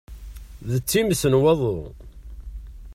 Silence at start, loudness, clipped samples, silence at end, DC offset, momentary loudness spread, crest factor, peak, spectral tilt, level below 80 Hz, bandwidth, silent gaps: 0.1 s; -21 LUFS; under 0.1%; 0 s; under 0.1%; 24 LU; 16 dB; -6 dBFS; -5.5 dB/octave; -40 dBFS; 16 kHz; none